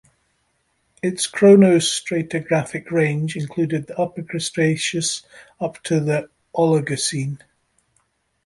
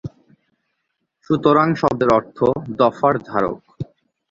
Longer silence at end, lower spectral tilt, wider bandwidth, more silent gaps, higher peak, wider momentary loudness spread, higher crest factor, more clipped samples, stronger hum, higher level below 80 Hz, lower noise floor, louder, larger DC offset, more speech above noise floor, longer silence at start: first, 1.1 s vs 0.45 s; second, -5 dB/octave vs -8 dB/octave; first, 11.5 kHz vs 7.6 kHz; neither; about the same, -2 dBFS vs -2 dBFS; second, 14 LU vs 19 LU; about the same, 18 dB vs 18 dB; neither; neither; second, -60 dBFS vs -52 dBFS; second, -68 dBFS vs -74 dBFS; about the same, -20 LUFS vs -18 LUFS; neither; second, 48 dB vs 57 dB; first, 1.05 s vs 0.05 s